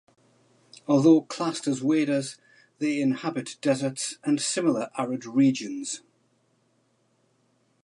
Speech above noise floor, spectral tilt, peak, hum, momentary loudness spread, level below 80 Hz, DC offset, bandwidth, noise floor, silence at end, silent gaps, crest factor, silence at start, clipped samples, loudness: 44 dB; -5 dB/octave; -8 dBFS; none; 11 LU; -80 dBFS; under 0.1%; 11.5 kHz; -68 dBFS; 1.85 s; none; 20 dB; 0.9 s; under 0.1%; -25 LUFS